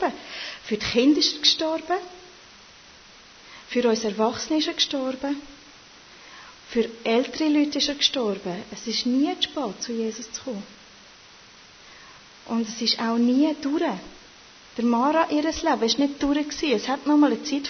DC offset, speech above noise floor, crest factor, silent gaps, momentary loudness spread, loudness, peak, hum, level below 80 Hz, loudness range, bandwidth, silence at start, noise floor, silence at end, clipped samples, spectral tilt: under 0.1%; 26 dB; 18 dB; none; 16 LU; -24 LUFS; -6 dBFS; none; -58 dBFS; 5 LU; 6.6 kHz; 0 s; -49 dBFS; 0 s; under 0.1%; -3 dB/octave